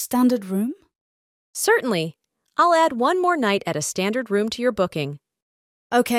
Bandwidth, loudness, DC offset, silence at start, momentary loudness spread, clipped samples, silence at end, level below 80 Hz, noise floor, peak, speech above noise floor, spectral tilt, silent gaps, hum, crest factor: 16.5 kHz; -21 LUFS; under 0.1%; 0 s; 12 LU; under 0.1%; 0 s; -62 dBFS; under -90 dBFS; -6 dBFS; over 69 dB; -4 dB/octave; 1.01-1.54 s, 5.42-5.90 s; none; 16 dB